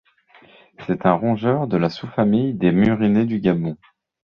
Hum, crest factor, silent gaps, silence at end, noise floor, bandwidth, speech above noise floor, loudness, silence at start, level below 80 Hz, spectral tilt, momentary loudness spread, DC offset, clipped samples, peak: none; 18 dB; none; 0.6 s; -52 dBFS; 6.2 kHz; 33 dB; -19 LUFS; 0.8 s; -50 dBFS; -9.5 dB/octave; 9 LU; under 0.1%; under 0.1%; -2 dBFS